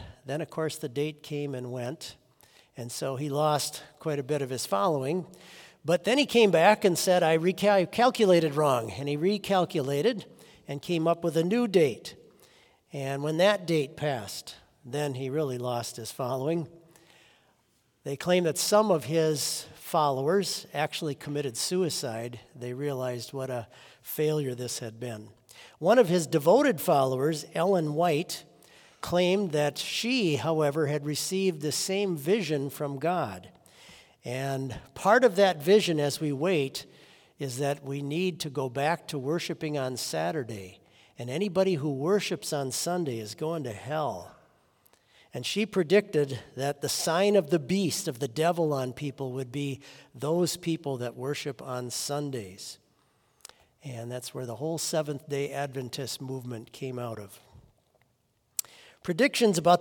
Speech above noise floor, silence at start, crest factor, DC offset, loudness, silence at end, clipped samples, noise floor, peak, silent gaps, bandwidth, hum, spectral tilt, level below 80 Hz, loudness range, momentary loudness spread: 44 dB; 0 s; 24 dB; under 0.1%; -28 LUFS; 0 s; under 0.1%; -72 dBFS; -6 dBFS; none; 18 kHz; none; -4.5 dB/octave; -70 dBFS; 9 LU; 15 LU